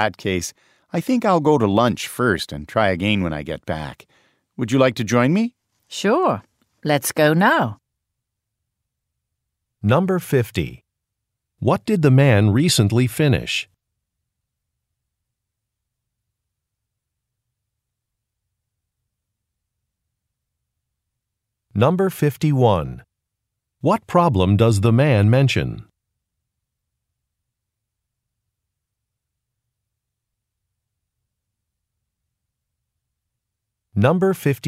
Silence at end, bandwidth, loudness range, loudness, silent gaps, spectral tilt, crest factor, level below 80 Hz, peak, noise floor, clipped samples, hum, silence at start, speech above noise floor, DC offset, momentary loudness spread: 0 s; 16 kHz; 7 LU; -19 LUFS; none; -6 dB/octave; 20 dB; -50 dBFS; -2 dBFS; -81 dBFS; under 0.1%; none; 0 s; 63 dB; under 0.1%; 13 LU